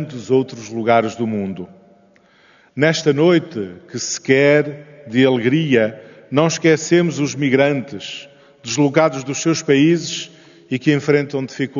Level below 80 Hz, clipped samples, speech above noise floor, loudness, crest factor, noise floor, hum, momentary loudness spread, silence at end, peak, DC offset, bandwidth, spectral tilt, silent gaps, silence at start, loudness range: -64 dBFS; under 0.1%; 35 dB; -17 LUFS; 18 dB; -52 dBFS; none; 14 LU; 0 s; 0 dBFS; under 0.1%; 7.4 kHz; -5 dB/octave; none; 0 s; 3 LU